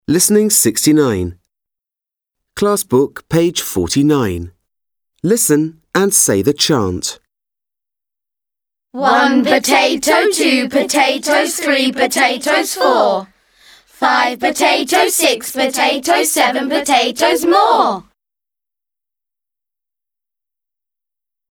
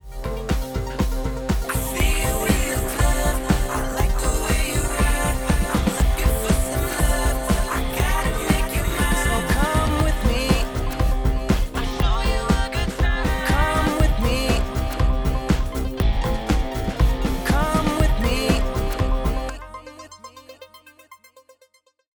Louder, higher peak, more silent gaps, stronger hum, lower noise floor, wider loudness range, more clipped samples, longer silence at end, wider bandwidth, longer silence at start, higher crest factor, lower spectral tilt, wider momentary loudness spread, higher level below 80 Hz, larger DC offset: first, -13 LUFS vs -22 LUFS; first, 0 dBFS vs -4 dBFS; neither; neither; first, -88 dBFS vs -59 dBFS; about the same, 4 LU vs 2 LU; neither; first, 3.5 s vs 1 s; about the same, over 20 kHz vs over 20 kHz; about the same, 0.1 s vs 0.05 s; about the same, 16 dB vs 16 dB; second, -3 dB/octave vs -5 dB/octave; about the same, 7 LU vs 6 LU; second, -50 dBFS vs -24 dBFS; neither